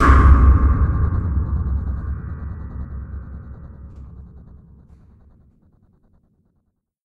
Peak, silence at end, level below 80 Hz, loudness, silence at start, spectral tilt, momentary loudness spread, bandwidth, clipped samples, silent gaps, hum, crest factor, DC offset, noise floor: 0 dBFS; 2.65 s; -20 dBFS; -19 LUFS; 0 s; -8.5 dB/octave; 27 LU; 3.7 kHz; under 0.1%; none; none; 20 dB; under 0.1%; -69 dBFS